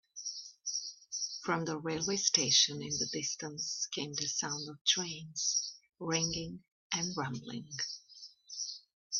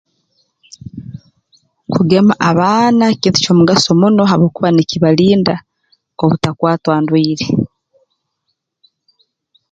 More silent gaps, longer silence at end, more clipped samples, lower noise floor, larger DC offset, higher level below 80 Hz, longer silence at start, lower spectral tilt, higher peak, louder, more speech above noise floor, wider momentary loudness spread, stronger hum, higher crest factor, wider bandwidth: first, 4.81-4.85 s, 6.72-6.90 s, 8.93-9.10 s vs none; second, 0 s vs 2.05 s; neither; second, -56 dBFS vs -71 dBFS; neither; second, -70 dBFS vs -48 dBFS; second, 0.15 s vs 0.95 s; second, -1.5 dB/octave vs -6 dB/octave; second, -10 dBFS vs 0 dBFS; second, -34 LUFS vs -12 LUFS; second, 21 dB vs 60 dB; about the same, 15 LU vs 15 LU; neither; first, 26 dB vs 14 dB; second, 7.6 kHz vs 8.8 kHz